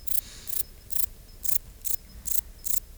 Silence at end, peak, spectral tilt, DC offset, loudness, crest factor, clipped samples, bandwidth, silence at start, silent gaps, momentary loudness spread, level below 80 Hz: 0 s; -8 dBFS; -0.5 dB/octave; under 0.1%; -27 LUFS; 24 dB; under 0.1%; over 20 kHz; 0 s; none; 4 LU; -48 dBFS